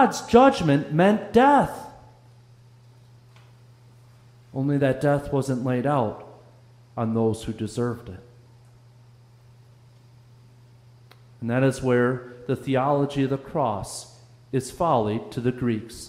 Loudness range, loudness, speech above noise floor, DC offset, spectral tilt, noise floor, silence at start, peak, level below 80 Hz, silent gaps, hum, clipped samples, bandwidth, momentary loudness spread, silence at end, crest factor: 9 LU; -23 LUFS; 30 dB; under 0.1%; -6.5 dB/octave; -52 dBFS; 0 s; -2 dBFS; -54 dBFS; none; none; under 0.1%; 15.5 kHz; 17 LU; 0 s; 22 dB